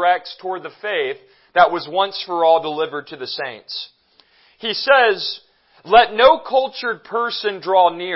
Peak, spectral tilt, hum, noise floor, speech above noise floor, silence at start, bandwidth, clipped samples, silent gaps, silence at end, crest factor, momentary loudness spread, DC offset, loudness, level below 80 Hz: 0 dBFS; -6.5 dB/octave; none; -56 dBFS; 38 dB; 0 s; 5.8 kHz; under 0.1%; none; 0 s; 18 dB; 15 LU; under 0.1%; -18 LUFS; -58 dBFS